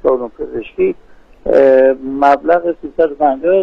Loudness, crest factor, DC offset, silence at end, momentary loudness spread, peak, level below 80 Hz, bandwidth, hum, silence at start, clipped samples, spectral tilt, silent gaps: -13 LUFS; 12 dB; under 0.1%; 0 s; 14 LU; 0 dBFS; -42 dBFS; 5.8 kHz; none; 0.05 s; under 0.1%; -7.5 dB/octave; none